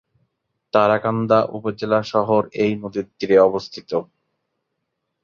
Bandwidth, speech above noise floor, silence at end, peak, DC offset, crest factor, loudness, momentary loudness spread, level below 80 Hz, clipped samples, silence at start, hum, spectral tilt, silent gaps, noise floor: 7.2 kHz; 58 dB; 1.2 s; -2 dBFS; under 0.1%; 18 dB; -20 LUFS; 11 LU; -60 dBFS; under 0.1%; 0.75 s; none; -7 dB/octave; none; -77 dBFS